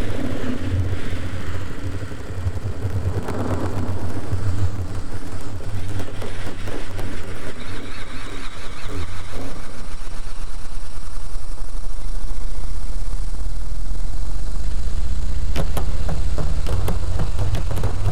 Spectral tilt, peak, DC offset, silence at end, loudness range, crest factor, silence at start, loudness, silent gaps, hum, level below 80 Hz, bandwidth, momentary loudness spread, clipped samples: -6 dB/octave; -4 dBFS; 20%; 0 s; 8 LU; 12 dB; 0 s; -29 LUFS; none; none; -26 dBFS; 12.5 kHz; 10 LU; under 0.1%